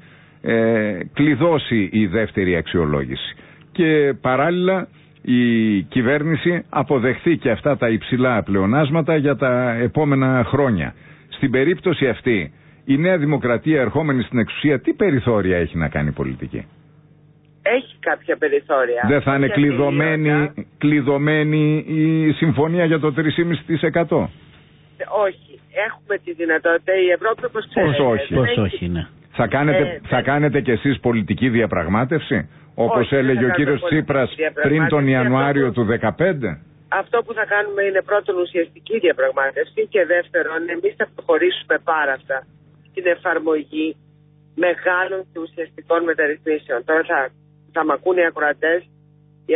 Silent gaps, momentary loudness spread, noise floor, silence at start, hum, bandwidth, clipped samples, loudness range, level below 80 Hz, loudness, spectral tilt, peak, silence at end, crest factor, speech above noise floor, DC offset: none; 8 LU; -51 dBFS; 0.45 s; 50 Hz at -50 dBFS; 4 kHz; under 0.1%; 4 LU; -44 dBFS; -19 LUFS; -12 dB/octave; -6 dBFS; 0 s; 14 dB; 33 dB; under 0.1%